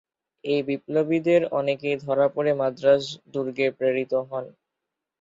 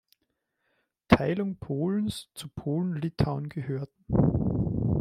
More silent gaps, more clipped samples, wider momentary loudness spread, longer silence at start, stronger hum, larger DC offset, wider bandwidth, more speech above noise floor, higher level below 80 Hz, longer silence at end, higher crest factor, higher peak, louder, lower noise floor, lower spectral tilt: neither; neither; about the same, 10 LU vs 11 LU; second, 0.45 s vs 1.1 s; neither; neither; second, 7.8 kHz vs 14.5 kHz; first, 61 dB vs 50 dB; second, -68 dBFS vs -46 dBFS; first, 0.7 s vs 0 s; second, 18 dB vs 26 dB; second, -6 dBFS vs -2 dBFS; first, -24 LUFS vs -28 LUFS; first, -84 dBFS vs -79 dBFS; about the same, -6.5 dB/octave vs -7.5 dB/octave